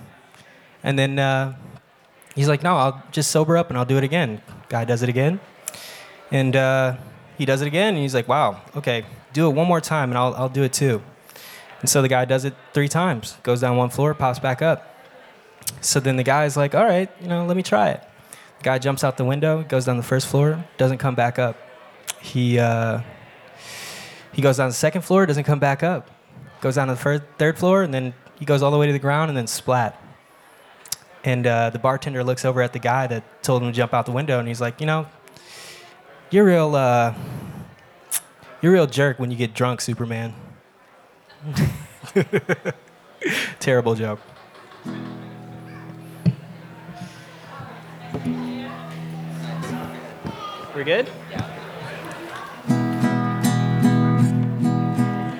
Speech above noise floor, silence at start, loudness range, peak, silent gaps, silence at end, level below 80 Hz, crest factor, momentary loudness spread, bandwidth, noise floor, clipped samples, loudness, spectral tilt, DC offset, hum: 33 dB; 0 s; 7 LU; -2 dBFS; none; 0 s; -58 dBFS; 20 dB; 17 LU; 18.5 kHz; -53 dBFS; under 0.1%; -21 LUFS; -5.5 dB/octave; under 0.1%; none